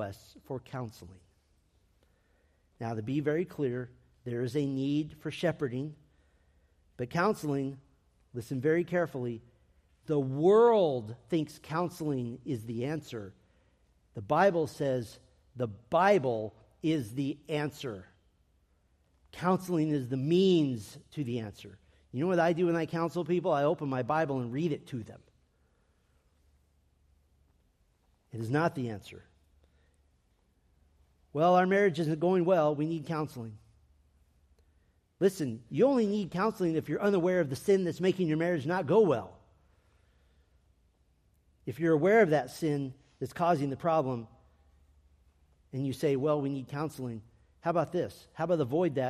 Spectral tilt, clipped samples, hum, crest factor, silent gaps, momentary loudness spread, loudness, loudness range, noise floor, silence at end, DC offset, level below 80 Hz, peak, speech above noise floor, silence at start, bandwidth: -7 dB/octave; under 0.1%; none; 20 dB; none; 17 LU; -30 LUFS; 8 LU; -70 dBFS; 0 s; under 0.1%; -68 dBFS; -12 dBFS; 41 dB; 0 s; 14.5 kHz